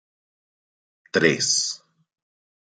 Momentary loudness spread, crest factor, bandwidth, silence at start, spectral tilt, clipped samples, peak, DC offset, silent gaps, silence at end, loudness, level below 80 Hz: 10 LU; 24 dB; 10.5 kHz; 1.15 s; -2 dB/octave; under 0.1%; -2 dBFS; under 0.1%; none; 1 s; -21 LUFS; -70 dBFS